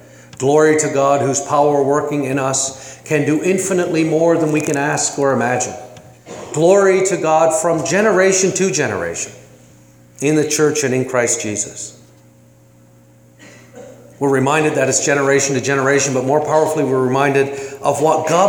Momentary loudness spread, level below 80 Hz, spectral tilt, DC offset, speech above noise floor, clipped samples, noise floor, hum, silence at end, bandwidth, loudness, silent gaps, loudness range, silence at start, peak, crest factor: 9 LU; -60 dBFS; -4 dB/octave; under 0.1%; 32 dB; under 0.1%; -47 dBFS; none; 0 s; 19 kHz; -15 LUFS; none; 5 LU; 0.4 s; 0 dBFS; 16 dB